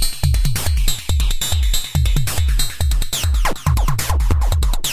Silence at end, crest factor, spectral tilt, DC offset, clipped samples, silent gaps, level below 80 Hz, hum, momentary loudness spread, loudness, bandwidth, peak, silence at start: 0 s; 12 dB; -3.5 dB/octave; under 0.1%; under 0.1%; none; -18 dBFS; none; 2 LU; -19 LUFS; 16 kHz; -2 dBFS; 0 s